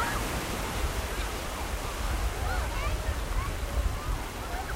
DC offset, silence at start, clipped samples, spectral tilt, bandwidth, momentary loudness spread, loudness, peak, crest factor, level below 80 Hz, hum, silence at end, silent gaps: under 0.1%; 0 s; under 0.1%; -4 dB/octave; 16 kHz; 3 LU; -33 LUFS; -16 dBFS; 14 dB; -34 dBFS; none; 0 s; none